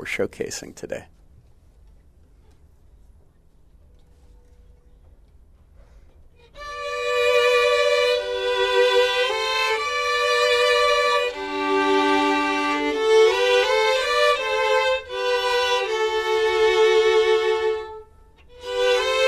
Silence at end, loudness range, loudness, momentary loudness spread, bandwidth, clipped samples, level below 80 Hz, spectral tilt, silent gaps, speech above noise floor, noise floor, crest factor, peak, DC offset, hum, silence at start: 0 s; 6 LU; -20 LUFS; 13 LU; 14.5 kHz; under 0.1%; -52 dBFS; -2 dB/octave; none; 23 dB; -53 dBFS; 16 dB; -6 dBFS; under 0.1%; none; 0 s